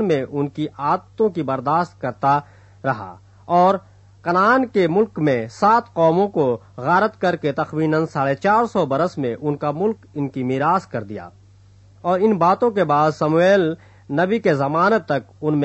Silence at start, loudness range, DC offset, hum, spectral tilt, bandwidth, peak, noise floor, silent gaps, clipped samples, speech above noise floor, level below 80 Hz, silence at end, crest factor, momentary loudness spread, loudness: 0 s; 4 LU; under 0.1%; none; -7.5 dB/octave; 8.4 kHz; -4 dBFS; -49 dBFS; none; under 0.1%; 30 dB; -60 dBFS; 0 s; 16 dB; 9 LU; -19 LUFS